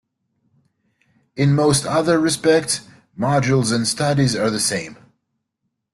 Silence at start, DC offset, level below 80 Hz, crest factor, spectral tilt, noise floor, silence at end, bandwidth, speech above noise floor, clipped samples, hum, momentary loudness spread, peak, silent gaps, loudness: 1.35 s; under 0.1%; -52 dBFS; 16 dB; -4.5 dB/octave; -76 dBFS; 1 s; 12.5 kHz; 58 dB; under 0.1%; none; 8 LU; -4 dBFS; none; -18 LUFS